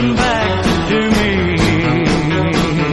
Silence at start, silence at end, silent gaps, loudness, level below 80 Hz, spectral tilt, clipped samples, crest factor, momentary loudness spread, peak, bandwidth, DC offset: 0 s; 0 s; none; -14 LUFS; -28 dBFS; -5.5 dB/octave; under 0.1%; 14 dB; 1 LU; 0 dBFS; 12 kHz; under 0.1%